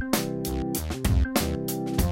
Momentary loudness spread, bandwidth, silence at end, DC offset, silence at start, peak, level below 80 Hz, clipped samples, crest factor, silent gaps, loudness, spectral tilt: 5 LU; 17 kHz; 0 s; under 0.1%; 0 s; -8 dBFS; -32 dBFS; under 0.1%; 18 dB; none; -27 LUFS; -5 dB/octave